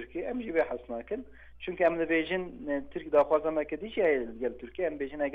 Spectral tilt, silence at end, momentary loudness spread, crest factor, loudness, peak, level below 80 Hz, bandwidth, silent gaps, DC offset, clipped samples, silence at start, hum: -7.5 dB/octave; 0 s; 11 LU; 18 dB; -31 LUFS; -12 dBFS; -56 dBFS; 4.9 kHz; none; under 0.1%; under 0.1%; 0 s; none